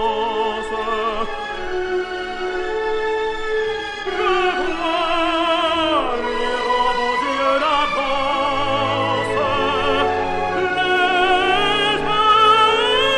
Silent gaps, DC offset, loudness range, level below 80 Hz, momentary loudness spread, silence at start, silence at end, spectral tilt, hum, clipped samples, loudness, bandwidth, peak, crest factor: none; under 0.1%; 6 LU; -40 dBFS; 9 LU; 0 s; 0 s; -4 dB/octave; none; under 0.1%; -18 LUFS; 11 kHz; -4 dBFS; 16 dB